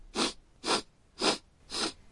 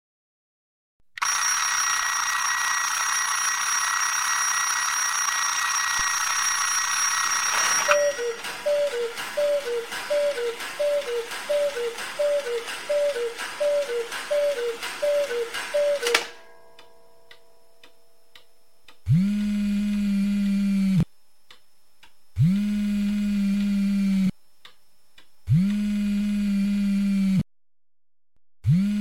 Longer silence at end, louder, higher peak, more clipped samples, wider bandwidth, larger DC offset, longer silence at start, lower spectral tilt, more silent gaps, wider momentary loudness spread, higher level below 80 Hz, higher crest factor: about the same, 0 s vs 0 s; second, -32 LUFS vs -24 LUFS; second, -12 dBFS vs -2 dBFS; neither; second, 11.5 kHz vs 16.5 kHz; second, under 0.1% vs 0.5%; second, 0 s vs 1.2 s; second, -1.5 dB/octave vs -3.5 dB/octave; neither; about the same, 8 LU vs 8 LU; second, -58 dBFS vs -52 dBFS; about the same, 22 dB vs 24 dB